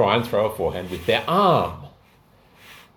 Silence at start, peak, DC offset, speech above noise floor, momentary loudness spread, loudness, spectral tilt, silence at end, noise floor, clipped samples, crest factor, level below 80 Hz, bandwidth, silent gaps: 0 s; -4 dBFS; under 0.1%; 34 dB; 10 LU; -21 LUFS; -6 dB/octave; 0.2 s; -55 dBFS; under 0.1%; 20 dB; -50 dBFS; 19 kHz; none